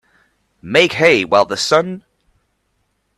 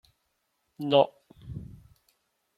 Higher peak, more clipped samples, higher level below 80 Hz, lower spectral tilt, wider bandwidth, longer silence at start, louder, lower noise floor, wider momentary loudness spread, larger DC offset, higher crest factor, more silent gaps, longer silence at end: first, 0 dBFS vs -8 dBFS; neither; about the same, -56 dBFS vs -60 dBFS; second, -3.5 dB/octave vs -7.5 dB/octave; about the same, 13 kHz vs 13 kHz; second, 0.65 s vs 0.8 s; first, -14 LUFS vs -26 LUFS; second, -66 dBFS vs -77 dBFS; second, 10 LU vs 20 LU; neither; second, 18 dB vs 24 dB; neither; first, 1.2 s vs 0.95 s